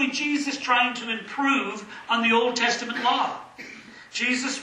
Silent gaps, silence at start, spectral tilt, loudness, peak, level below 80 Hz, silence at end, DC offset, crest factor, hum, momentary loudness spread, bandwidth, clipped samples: none; 0 s; -2 dB/octave; -24 LUFS; -6 dBFS; -72 dBFS; 0 s; under 0.1%; 18 dB; none; 17 LU; 11 kHz; under 0.1%